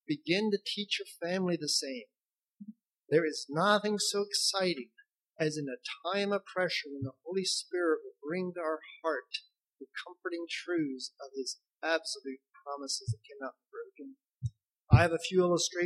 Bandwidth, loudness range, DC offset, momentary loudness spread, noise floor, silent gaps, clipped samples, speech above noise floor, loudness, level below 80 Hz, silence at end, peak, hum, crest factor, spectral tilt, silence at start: 13 kHz; 7 LU; under 0.1%; 17 LU; -56 dBFS; none; under 0.1%; 24 dB; -32 LUFS; -56 dBFS; 0 s; -8 dBFS; none; 24 dB; -4 dB/octave; 0.1 s